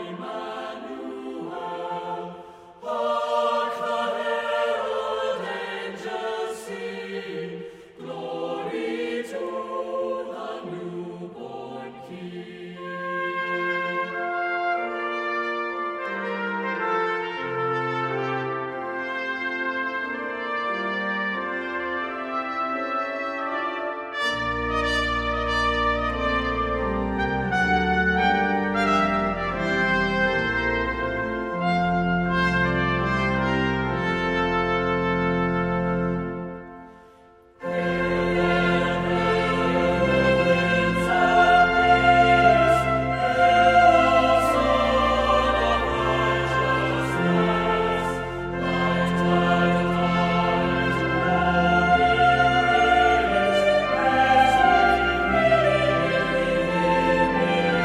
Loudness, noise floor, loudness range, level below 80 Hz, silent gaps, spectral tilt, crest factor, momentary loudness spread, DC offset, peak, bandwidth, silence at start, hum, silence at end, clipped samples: -22 LUFS; -52 dBFS; 12 LU; -40 dBFS; none; -6 dB/octave; 18 dB; 15 LU; under 0.1%; -4 dBFS; 13 kHz; 0 s; none; 0 s; under 0.1%